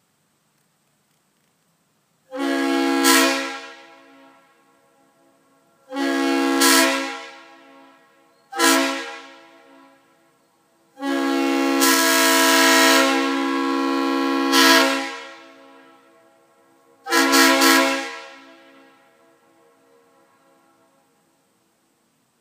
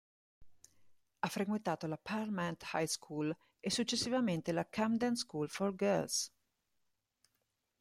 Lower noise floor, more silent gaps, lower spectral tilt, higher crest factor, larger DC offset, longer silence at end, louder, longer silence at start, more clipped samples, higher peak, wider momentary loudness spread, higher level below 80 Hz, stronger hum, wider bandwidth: second, -66 dBFS vs -84 dBFS; neither; second, 0.5 dB/octave vs -4 dB/octave; about the same, 22 dB vs 18 dB; neither; first, 4.05 s vs 1.55 s; first, -17 LUFS vs -37 LUFS; first, 2.3 s vs 0.4 s; neither; first, 0 dBFS vs -20 dBFS; first, 21 LU vs 6 LU; second, -80 dBFS vs -74 dBFS; neither; about the same, 15.5 kHz vs 16 kHz